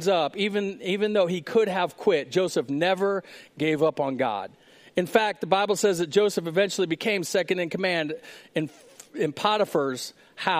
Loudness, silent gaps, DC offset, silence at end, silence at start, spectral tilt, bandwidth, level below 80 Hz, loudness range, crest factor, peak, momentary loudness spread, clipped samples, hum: -25 LUFS; none; under 0.1%; 0 s; 0 s; -4.5 dB/octave; 15.5 kHz; -72 dBFS; 2 LU; 20 dB; -4 dBFS; 9 LU; under 0.1%; none